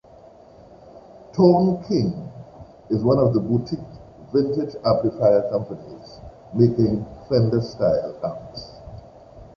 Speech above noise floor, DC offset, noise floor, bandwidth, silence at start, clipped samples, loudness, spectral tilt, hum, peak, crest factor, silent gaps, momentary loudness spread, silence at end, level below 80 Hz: 27 dB; under 0.1%; -47 dBFS; 6.8 kHz; 0.95 s; under 0.1%; -21 LUFS; -9 dB/octave; none; -2 dBFS; 20 dB; none; 22 LU; 0.1 s; -48 dBFS